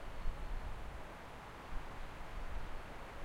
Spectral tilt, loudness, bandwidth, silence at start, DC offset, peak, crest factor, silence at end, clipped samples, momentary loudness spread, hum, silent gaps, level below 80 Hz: -5.5 dB/octave; -50 LUFS; 13 kHz; 0 s; under 0.1%; -26 dBFS; 18 dB; 0 s; under 0.1%; 3 LU; none; none; -44 dBFS